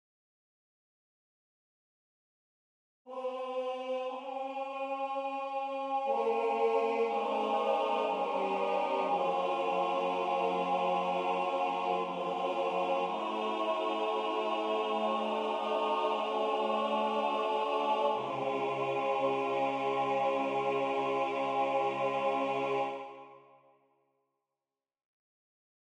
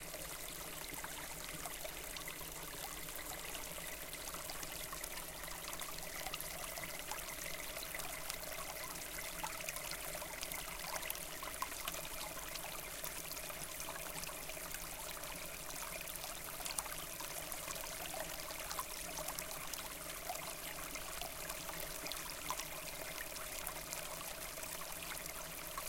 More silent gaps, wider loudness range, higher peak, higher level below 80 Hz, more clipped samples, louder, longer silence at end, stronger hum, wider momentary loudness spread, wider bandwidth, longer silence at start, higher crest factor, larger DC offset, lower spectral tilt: neither; first, 8 LU vs 2 LU; about the same, -18 dBFS vs -16 dBFS; second, -84 dBFS vs -58 dBFS; neither; first, -32 LUFS vs -44 LUFS; first, 2.45 s vs 0 s; neither; first, 6 LU vs 3 LU; second, 10 kHz vs 17 kHz; first, 3.05 s vs 0 s; second, 14 dB vs 30 dB; neither; first, -5 dB/octave vs -1 dB/octave